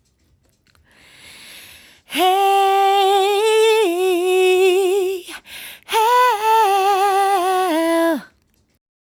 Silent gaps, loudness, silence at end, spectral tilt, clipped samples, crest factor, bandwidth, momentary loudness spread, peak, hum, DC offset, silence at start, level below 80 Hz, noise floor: none; -16 LUFS; 0.9 s; -1.5 dB/octave; under 0.1%; 12 dB; 19.5 kHz; 12 LU; -4 dBFS; none; under 0.1%; 1.5 s; -64 dBFS; -60 dBFS